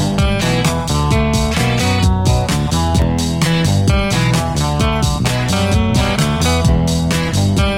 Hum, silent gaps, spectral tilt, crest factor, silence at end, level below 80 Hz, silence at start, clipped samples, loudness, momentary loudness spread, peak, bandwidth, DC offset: none; none; -5 dB/octave; 12 dB; 0 s; -24 dBFS; 0 s; under 0.1%; -15 LUFS; 2 LU; -2 dBFS; over 20 kHz; under 0.1%